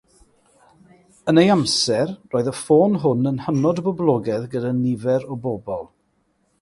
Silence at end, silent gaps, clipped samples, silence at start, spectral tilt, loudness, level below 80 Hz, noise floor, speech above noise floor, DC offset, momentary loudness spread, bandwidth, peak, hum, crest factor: 0.75 s; none; under 0.1%; 1.25 s; -5.5 dB/octave; -20 LUFS; -58 dBFS; -66 dBFS; 47 dB; under 0.1%; 11 LU; 11.5 kHz; -4 dBFS; none; 18 dB